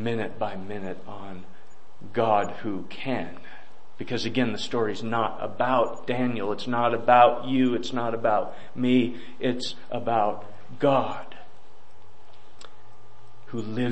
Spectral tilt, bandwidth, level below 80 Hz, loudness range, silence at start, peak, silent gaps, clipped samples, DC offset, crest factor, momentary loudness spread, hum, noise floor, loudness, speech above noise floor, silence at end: -6 dB/octave; 8.6 kHz; -66 dBFS; 8 LU; 0 s; -6 dBFS; none; under 0.1%; 3%; 22 dB; 16 LU; none; -55 dBFS; -26 LUFS; 30 dB; 0 s